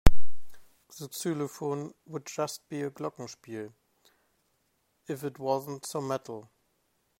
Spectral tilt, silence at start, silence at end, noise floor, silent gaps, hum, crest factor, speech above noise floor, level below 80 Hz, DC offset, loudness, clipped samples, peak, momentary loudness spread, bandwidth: -5.5 dB/octave; 0.05 s; 0 s; -74 dBFS; none; none; 24 dB; 40 dB; -38 dBFS; under 0.1%; -35 LUFS; under 0.1%; -2 dBFS; 13 LU; 16 kHz